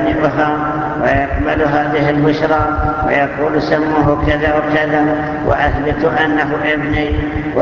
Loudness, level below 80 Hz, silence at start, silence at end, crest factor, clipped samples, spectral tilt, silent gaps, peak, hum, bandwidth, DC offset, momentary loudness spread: -14 LUFS; -28 dBFS; 0 s; 0 s; 14 dB; under 0.1%; -8 dB/octave; none; 0 dBFS; none; 7 kHz; under 0.1%; 3 LU